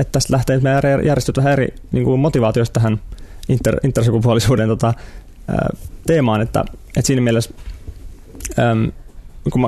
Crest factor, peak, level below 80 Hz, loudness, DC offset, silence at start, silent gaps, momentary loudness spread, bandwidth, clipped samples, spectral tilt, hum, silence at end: 14 dB; -2 dBFS; -34 dBFS; -17 LUFS; under 0.1%; 0 s; none; 12 LU; 14 kHz; under 0.1%; -6.5 dB/octave; none; 0 s